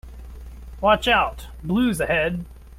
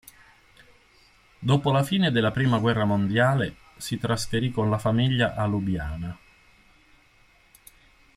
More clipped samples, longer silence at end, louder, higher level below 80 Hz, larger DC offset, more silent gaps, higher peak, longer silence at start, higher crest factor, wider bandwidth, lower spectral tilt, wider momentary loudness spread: neither; second, 0 s vs 2 s; first, -21 LUFS vs -24 LUFS; first, -38 dBFS vs -48 dBFS; neither; neither; first, -4 dBFS vs -8 dBFS; second, 0.05 s vs 1.4 s; about the same, 18 dB vs 18 dB; about the same, 16 kHz vs 15 kHz; about the same, -5 dB/octave vs -6 dB/octave; first, 23 LU vs 11 LU